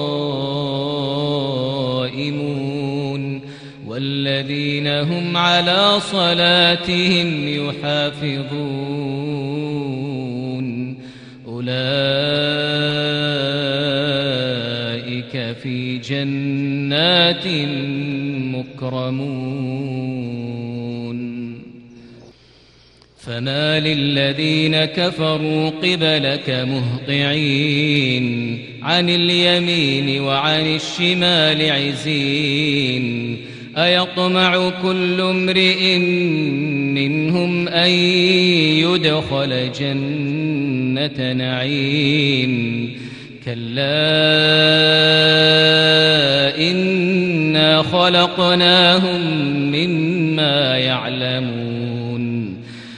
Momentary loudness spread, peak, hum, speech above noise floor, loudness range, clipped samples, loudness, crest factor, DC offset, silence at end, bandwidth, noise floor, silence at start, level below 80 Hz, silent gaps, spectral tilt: 13 LU; 0 dBFS; none; 33 dB; 10 LU; under 0.1%; -17 LUFS; 18 dB; under 0.1%; 0 s; 10.5 kHz; -49 dBFS; 0 s; -54 dBFS; none; -5.5 dB/octave